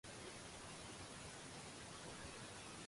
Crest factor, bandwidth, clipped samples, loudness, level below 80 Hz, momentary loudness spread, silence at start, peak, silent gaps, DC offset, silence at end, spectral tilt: 14 dB; 11.5 kHz; under 0.1%; -53 LUFS; -70 dBFS; 1 LU; 0.05 s; -40 dBFS; none; under 0.1%; 0 s; -3 dB/octave